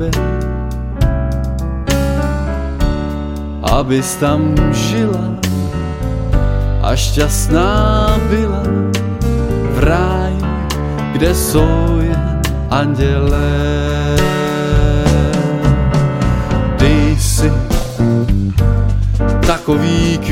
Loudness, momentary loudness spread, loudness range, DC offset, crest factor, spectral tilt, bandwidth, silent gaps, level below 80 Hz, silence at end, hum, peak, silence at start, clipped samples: -15 LUFS; 6 LU; 2 LU; under 0.1%; 12 dB; -6 dB/octave; 16.5 kHz; none; -18 dBFS; 0 s; none; 0 dBFS; 0 s; under 0.1%